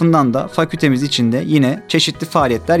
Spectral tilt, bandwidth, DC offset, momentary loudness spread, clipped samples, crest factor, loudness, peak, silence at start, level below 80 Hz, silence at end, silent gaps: -5.5 dB/octave; 16 kHz; under 0.1%; 2 LU; under 0.1%; 14 dB; -15 LUFS; 0 dBFS; 0 s; -48 dBFS; 0 s; none